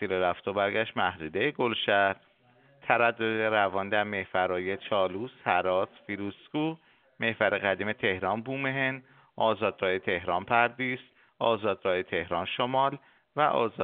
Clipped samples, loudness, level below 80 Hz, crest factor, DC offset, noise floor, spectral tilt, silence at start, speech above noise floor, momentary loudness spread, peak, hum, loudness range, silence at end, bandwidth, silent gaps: under 0.1%; -28 LUFS; -68 dBFS; 22 dB; under 0.1%; -62 dBFS; -2.5 dB/octave; 0 s; 33 dB; 8 LU; -6 dBFS; none; 2 LU; 0 s; 4.6 kHz; none